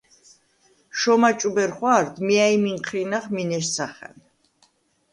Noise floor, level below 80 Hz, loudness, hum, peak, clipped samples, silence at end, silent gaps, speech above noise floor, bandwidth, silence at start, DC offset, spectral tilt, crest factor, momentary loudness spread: -63 dBFS; -68 dBFS; -21 LUFS; none; -6 dBFS; under 0.1%; 1.05 s; none; 42 dB; 11.5 kHz; 0.95 s; under 0.1%; -4 dB/octave; 18 dB; 10 LU